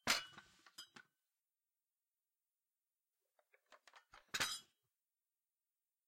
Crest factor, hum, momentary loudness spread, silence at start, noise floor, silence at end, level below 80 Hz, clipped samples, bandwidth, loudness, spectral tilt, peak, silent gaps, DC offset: 32 dB; none; 26 LU; 0.05 s; under -90 dBFS; 1.45 s; -82 dBFS; under 0.1%; 16 kHz; -42 LUFS; 0 dB/octave; -18 dBFS; none; under 0.1%